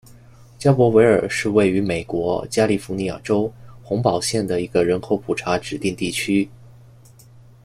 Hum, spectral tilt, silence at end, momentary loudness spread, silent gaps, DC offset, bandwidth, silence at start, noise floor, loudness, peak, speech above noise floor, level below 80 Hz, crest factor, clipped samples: none; -5.5 dB/octave; 0.95 s; 9 LU; none; under 0.1%; 14 kHz; 0.6 s; -47 dBFS; -20 LUFS; -2 dBFS; 28 dB; -50 dBFS; 18 dB; under 0.1%